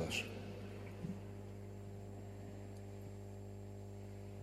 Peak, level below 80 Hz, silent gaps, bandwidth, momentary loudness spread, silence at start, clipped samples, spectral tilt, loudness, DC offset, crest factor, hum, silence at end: -28 dBFS; -62 dBFS; none; 15 kHz; 4 LU; 0 s; under 0.1%; -5 dB/octave; -49 LUFS; under 0.1%; 20 dB; 50 Hz at -50 dBFS; 0 s